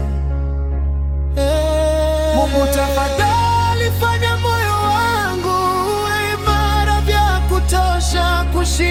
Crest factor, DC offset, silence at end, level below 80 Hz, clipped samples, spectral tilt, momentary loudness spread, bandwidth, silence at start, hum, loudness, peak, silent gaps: 14 dB; under 0.1%; 0 s; -20 dBFS; under 0.1%; -5 dB/octave; 5 LU; 16.5 kHz; 0 s; none; -16 LUFS; -2 dBFS; none